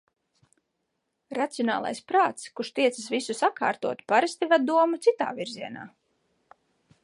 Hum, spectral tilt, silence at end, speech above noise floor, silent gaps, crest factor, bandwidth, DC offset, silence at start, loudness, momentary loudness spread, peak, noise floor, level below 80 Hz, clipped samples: none; -3.5 dB/octave; 1.15 s; 53 dB; none; 20 dB; 11.5 kHz; under 0.1%; 1.3 s; -26 LUFS; 13 LU; -8 dBFS; -79 dBFS; -80 dBFS; under 0.1%